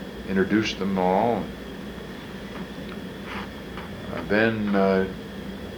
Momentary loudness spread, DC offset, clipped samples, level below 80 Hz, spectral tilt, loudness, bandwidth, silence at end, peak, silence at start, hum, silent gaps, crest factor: 15 LU; under 0.1%; under 0.1%; -48 dBFS; -6.5 dB/octave; -26 LUFS; over 20 kHz; 0 s; -6 dBFS; 0 s; none; none; 20 dB